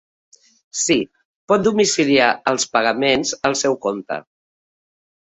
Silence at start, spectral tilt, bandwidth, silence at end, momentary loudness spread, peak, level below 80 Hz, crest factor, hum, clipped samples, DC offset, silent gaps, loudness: 0.75 s; -3 dB/octave; 8.4 kHz; 1.2 s; 13 LU; -2 dBFS; -58 dBFS; 18 dB; none; under 0.1%; under 0.1%; 1.25-1.48 s; -18 LUFS